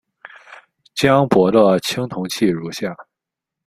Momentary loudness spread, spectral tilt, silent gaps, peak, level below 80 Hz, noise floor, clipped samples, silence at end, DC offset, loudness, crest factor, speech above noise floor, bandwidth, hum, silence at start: 14 LU; -5.5 dB/octave; none; 0 dBFS; -54 dBFS; -84 dBFS; under 0.1%; 0.65 s; under 0.1%; -17 LUFS; 18 dB; 68 dB; 15.5 kHz; none; 0.5 s